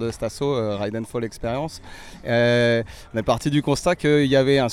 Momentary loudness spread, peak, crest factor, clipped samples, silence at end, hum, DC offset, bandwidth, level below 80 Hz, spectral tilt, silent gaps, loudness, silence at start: 12 LU; -6 dBFS; 16 dB; under 0.1%; 0 s; none; under 0.1%; 15 kHz; -44 dBFS; -6 dB/octave; none; -22 LUFS; 0 s